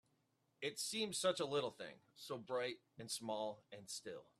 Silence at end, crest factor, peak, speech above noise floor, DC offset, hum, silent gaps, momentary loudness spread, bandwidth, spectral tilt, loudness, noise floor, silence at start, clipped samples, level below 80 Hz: 0.2 s; 20 dB; -26 dBFS; 37 dB; under 0.1%; none; none; 15 LU; 15 kHz; -2.5 dB/octave; -43 LUFS; -81 dBFS; 0.6 s; under 0.1%; -86 dBFS